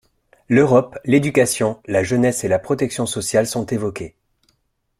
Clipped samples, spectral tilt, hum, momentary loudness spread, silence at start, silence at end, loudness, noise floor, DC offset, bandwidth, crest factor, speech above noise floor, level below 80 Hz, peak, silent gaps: under 0.1%; -5 dB/octave; none; 9 LU; 0.5 s; 0.9 s; -18 LUFS; -67 dBFS; under 0.1%; 16 kHz; 18 dB; 49 dB; -52 dBFS; -2 dBFS; none